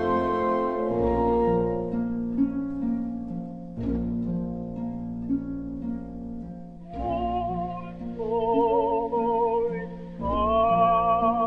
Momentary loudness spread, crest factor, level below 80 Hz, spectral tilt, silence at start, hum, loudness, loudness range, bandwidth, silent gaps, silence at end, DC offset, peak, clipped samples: 13 LU; 16 dB; -42 dBFS; -9.5 dB/octave; 0 s; none; -26 LUFS; 7 LU; 5.6 kHz; none; 0 s; 0.1%; -10 dBFS; under 0.1%